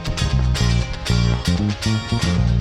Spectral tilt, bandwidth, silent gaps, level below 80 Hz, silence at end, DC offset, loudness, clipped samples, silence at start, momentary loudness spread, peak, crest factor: -5.5 dB/octave; 13 kHz; none; -24 dBFS; 0 s; under 0.1%; -20 LUFS; under 0.1%; 0 s; 3 LU; -6 dBFS; 14 dB